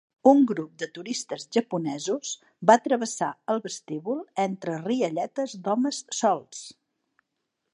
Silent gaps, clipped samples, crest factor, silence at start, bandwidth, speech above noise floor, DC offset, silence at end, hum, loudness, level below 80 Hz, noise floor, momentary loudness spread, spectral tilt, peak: none; under 0.1%; 22 dB; 0.25 s; 11 kHz; 55 dB; under 0.1%; 1 s; none; -26 LUFS; -80 dBFS; -81 dBFS; 14 LU; -4.5 dB/octave; -4 dBFS